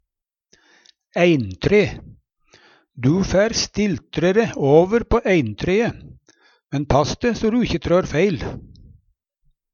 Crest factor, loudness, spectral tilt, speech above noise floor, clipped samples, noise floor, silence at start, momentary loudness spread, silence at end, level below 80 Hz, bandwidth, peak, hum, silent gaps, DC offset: 18 dB; -19 LUFS; -6 dB/octave; 65 dB; under 0.1%; -83 dBFS; 1.15 s; 10 LU; 1.15 s; -38 dBFS; 7.2 kHz; -2 dBFS; none; none; under 0.1%